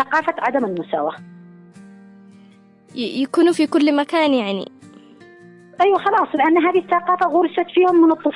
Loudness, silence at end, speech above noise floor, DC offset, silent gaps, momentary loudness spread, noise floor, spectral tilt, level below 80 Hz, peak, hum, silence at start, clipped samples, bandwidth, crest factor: -18 LUFS; 0 s; 31 dB; under 0.1%; none; 11 LU; -48 dBFS; -5.5 dB/octave; -68 dBFS; -6 dBFS; none; 0 s; under 0.1%; 11.5 kHz; 12 dB